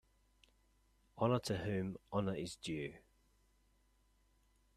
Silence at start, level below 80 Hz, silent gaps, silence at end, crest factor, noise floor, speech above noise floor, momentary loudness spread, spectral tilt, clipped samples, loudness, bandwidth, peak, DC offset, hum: 1.15 s; -68 dBFS; none; 1.75 s; 24 dB; -74 dBFS; 35 dB; 8 LU; -6 dB/octave; under 0.1%; -40 LUFS; 14 kHz; -20 dBFS; under 0.1%; none